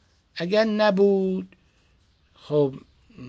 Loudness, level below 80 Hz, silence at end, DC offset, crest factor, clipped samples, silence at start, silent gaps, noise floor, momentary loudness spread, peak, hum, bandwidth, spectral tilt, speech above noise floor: -23 LUFS; -62 dBFS; 0 s; under 0.1%; 16 dB; under 0.1%; 0.35 s; none; -62 dBFS; 20 LU; -8 dBFS; none; 7.8 kHz; -7.5 dB/octave; 40 dB